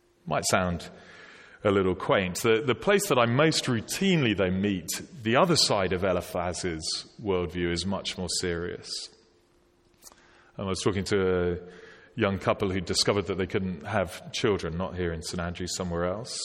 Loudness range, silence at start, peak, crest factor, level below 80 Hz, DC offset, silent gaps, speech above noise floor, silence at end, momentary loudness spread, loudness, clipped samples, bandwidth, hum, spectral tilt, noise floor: 7 LU; 0.25 s; -8 dBFS; 20 dB; -52 dBFS; under 0.1%; none; 37 dB; 0 s; 10 LU; -27 LUFS; under 0.1%; 16.5 kHz; none; -4.5 dB/octave; -64 dBFS